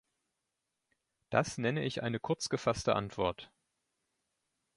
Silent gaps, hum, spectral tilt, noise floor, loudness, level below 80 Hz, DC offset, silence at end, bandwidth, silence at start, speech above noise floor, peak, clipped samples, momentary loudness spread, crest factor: none; none; -5 dB/octave; -86 dBFS; -34 LUFS; -62 dBFS; under 0.1%; 1.3 s; 11.5 kHz; 1.3 s; 53 dB; -12 dBFS; under 0.1%; 4 LU; 24 dB